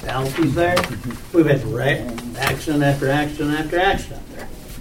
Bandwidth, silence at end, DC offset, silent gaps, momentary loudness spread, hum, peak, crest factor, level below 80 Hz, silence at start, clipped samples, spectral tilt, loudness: 16.5 kHz; 0 s; under 0.1%; none; 15 LU; none; -2 dBFS; 18 dB; -36 dBFS; 0 s; under 0.1%; -5.5 dB/octave; -20 LUFS